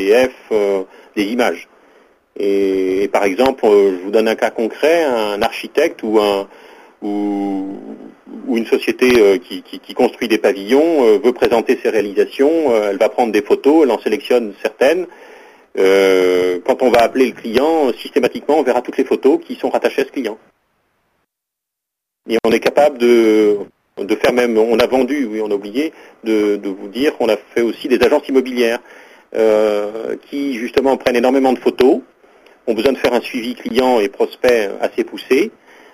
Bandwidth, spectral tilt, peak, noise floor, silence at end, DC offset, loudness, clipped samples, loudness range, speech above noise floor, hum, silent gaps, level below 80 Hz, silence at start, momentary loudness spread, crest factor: 15.5 kHz; -4.5 dB/octave; 0 dBFS; -81 dBFS; 0.45 s; under 0.1%; -15 LUFS; under 0.1%; 4 LU; 66 dB; none; none; -52 dBFS; 0 s; 11 LU; 16 dB